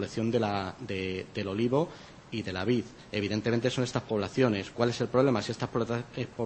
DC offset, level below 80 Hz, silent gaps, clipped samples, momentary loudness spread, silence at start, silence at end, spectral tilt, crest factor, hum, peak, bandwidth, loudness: under 0.1%; -60 dBFS; none; under 0.1%; 8 LU; 0 s; 0 s; -6 dB/octave; 20 dB; none; -10 dBFS; 8.8 kHz; -30 LUFS